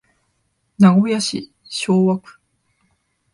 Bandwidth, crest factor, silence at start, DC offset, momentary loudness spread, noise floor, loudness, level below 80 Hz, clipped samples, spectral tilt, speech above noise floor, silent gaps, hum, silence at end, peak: 11.5 kHz; 18 dB; 0.8 s; under 0.1%; 14 LU; -68 dBFS; -17 LUFS; -64 dBFS; under 0.1%; -6 dB/octave; 52 dB; none; none; 1.15 s; 0 dBFS